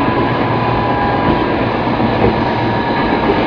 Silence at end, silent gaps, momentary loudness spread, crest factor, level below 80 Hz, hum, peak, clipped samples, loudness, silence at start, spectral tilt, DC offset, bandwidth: 0 s; none; 2 LU; 14 dB; -30 dBFS; none; 0 dBFS; under 0.1%; -14 LUFS; 0 s; -8.5 dB/octave; under 0.1%; 5.4 kHz